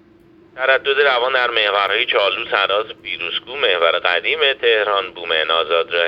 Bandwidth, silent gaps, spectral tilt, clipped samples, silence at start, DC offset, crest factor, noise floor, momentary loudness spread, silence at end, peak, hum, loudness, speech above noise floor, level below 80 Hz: 6 kHz; none; -3.5 dB/octave; under 0.1%; 0.55 s; under 0.1%; 18 dB; -49 dBFS; 7 LU; 0 s; 0 dBFS; none; -16 LUFS; 31 dB; -62 dBFS